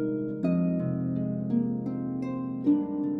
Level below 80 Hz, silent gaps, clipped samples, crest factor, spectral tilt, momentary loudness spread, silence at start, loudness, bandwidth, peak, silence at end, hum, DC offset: -64 dBFS; none; under 0.1%; 14 dB; -11.5 dB/octave; 6 LU; 0 s; -29 LUFS; 4.6 kHz; -14 dBFS; 0 s; none; under 0.1%